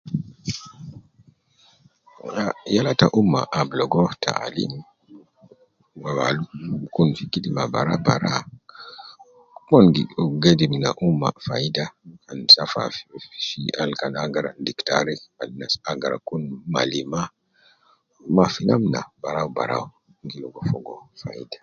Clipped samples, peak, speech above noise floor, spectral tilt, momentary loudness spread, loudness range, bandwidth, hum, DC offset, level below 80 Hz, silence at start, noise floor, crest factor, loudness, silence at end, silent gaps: under 0.1%; 0 dBFS; 39 dB; -5.5 dB/octave; 20 LU; 7 LU; 7.2 kHz; none; under 0.1%; -54 dBFS; 0.05 s; -60 dBFS; 24 dB; -21 LUFS; 0.05 s; none